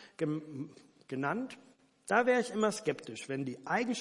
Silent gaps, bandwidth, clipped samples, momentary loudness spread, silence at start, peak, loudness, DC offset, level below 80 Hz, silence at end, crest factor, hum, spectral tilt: none; 11.5 kHz; under 0.1%; 16 LU; 0 s; -12 dBFS; -34 LUFS; under 0.1%; -84 dBFS; 0 s; 22 dB; none; -5 dB/octave